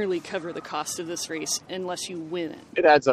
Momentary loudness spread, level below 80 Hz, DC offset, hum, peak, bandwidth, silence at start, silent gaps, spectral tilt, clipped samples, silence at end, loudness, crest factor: 12 LU; -66 dBFS; under 0.1%; none; -4 dBFS; 14.5 kHz; 0 s; none; -3 dB/octave; under 0.1%; 0 s; -27 LUFS; 22 dB